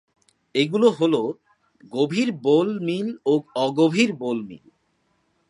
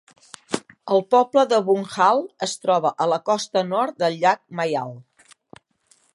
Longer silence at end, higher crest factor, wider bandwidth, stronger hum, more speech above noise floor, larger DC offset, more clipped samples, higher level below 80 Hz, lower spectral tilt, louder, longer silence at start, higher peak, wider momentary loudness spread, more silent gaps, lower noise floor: second, 0.95 s vs 1.15 s; about the same, 18 dB vs 18 dB; about the same, 11 kHz vs 11.5 kHz; neither; first, 47 dB vs 41 dB; neither; neither; about the same, -72 dBFS vs -74 dBFS; first, -6 dB/octave vs -4.5 dB/octave; about the same, -22 LUFS vs -21 LUFS; about the same, 0.55 s vs 0.5 s; about the same, -4 dBFS vs -4 dBFS; about the same, 11 LU vs 11 LU; neither; first, -68 dBFS vs -61 dBFS